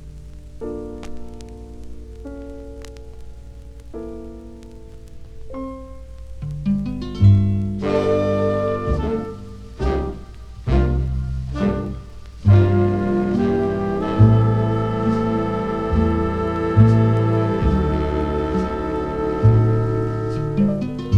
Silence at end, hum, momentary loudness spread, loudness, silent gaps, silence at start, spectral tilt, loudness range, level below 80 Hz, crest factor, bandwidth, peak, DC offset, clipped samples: 0 s; 50 Hz at -35 dBFS; 24 LU; -19 LUFS; none; 0 s; -9.5 dB/octave; 19 LU; -30 dBFS; 20 dB; 6.8 kHz; 0 dBFS; under 0.1%; under 0.1%